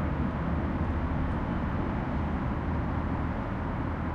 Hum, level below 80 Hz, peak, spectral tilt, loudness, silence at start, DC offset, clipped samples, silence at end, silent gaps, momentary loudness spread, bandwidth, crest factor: none; -36 dBFS; -18 dBFS; -9.5 dB/octave; -31 LUFS; 0 s; under 0.1%; under 0.1%; 0 s; none; 2 LU; 5.8 kHz; 12 dB